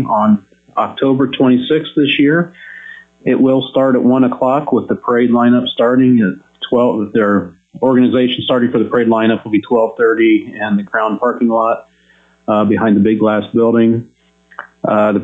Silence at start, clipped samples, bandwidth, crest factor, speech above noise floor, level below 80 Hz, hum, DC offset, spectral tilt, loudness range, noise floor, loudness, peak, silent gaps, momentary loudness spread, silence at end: 0 s; under 0.1%; 4 kHz; 10 dB; 39 dB; -56 dBFS; none; under 0.1%; -9 dB/octave; 2 LU; -51 dBFS; -13 LUFS; -2 dBFS; none; 8 LU; 0 s